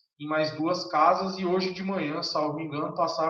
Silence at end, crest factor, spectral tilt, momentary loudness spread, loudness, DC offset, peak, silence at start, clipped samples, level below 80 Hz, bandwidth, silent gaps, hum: 0 s; 18 dB; -5.5 dB/octave; 8 LU; -27 LUFS; under 0.1%; -10 dBFS; 0.2 s; under 0.1%; -72 dBFS; 7.6 kHz; none; none